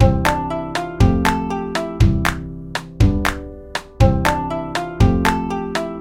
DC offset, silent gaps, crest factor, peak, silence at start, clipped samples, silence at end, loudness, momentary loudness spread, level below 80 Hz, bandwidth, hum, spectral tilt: under 0.1%; none; 18 dB; 0 dBFS; 0 s; under 0.1%; 0 s; -19 LUFS; 13 LU; -24 dBFS; 17 kHz; none; -6 dB/octave